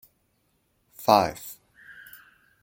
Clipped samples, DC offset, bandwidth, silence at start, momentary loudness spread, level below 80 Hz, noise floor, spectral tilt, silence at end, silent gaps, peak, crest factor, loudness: under 0.1%; under 0.1%; 17 kHz; 1 s; 26 LU; -62 dBFS; -71 dBFS; -4.5 dB/octave; 1.1 s; none; -2 dBFS; 26 dB; -23 LUFS